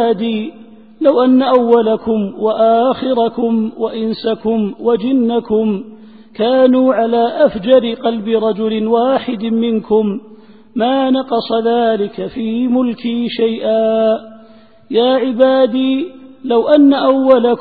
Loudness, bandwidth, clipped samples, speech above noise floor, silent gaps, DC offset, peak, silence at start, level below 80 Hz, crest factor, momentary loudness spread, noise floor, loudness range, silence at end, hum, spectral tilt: -14 LUFS; 4.9 kHz; under 0.1%; 30 dB; none; 0.4%; 0 dBFS; 0 s; -54 dBFS; 14 dB; 9 LU; -43 dBFS; 3 LU; 0 s; none; -9.5 dB/octave